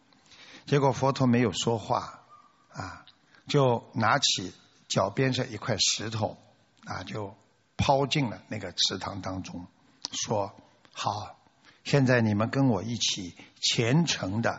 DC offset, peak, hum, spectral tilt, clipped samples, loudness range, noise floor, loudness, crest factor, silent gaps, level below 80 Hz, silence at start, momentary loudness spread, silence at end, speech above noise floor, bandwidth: under 0.1%; -8 dBFS; none; -4 dB/octave; under 0.1%; 4 LU; -57 dBFS; -27 LUFS; 20 dB; none; -60 dBFS; 0.4 s; 17 LU; 0 s; 30 dB; 8 kHz